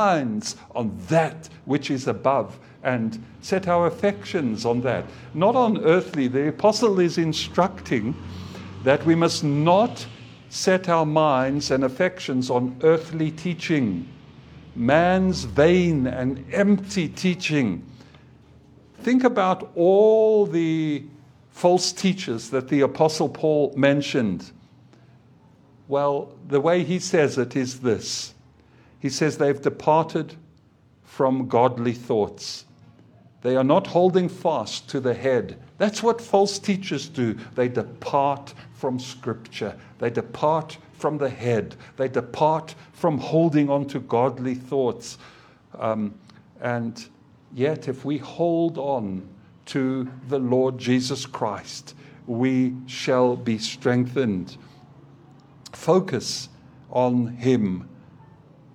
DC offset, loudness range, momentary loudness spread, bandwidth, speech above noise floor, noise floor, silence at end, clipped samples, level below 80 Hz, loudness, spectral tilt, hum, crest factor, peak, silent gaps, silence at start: under 0.1%; 6 LU; 12 LU; 14.5 kHz; 34 dB; -56 dBFS; 0.8 s; under 0.1%; -56 dBFS; -23 LUFS; -6 dB/octave; none; 20 dB; -2 dBFS; none; 0 s